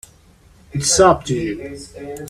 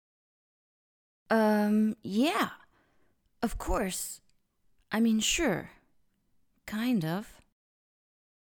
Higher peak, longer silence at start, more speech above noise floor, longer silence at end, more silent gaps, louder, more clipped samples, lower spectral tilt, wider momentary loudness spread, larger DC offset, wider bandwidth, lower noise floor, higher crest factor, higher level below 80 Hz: first, 0 dBFS vs -14 dBFS; second, 0.75 s vs 1.3 s; second, 32 dB vs 42 dB; second, 0 s vs 1.25 s; neither; first, -16 LUFS vs -30 LUFS; neither; about the same, -3.5 dB/octave vs -4 dB/octave; first, 20 LU vs 13 LU; neither; second, 15 kHz vs 19.5 kHz; second, -50 dBFS vs -71 dBFS; about the same, 18 dB vs 18 dB; first, -42 dBFS vs -50 dBFS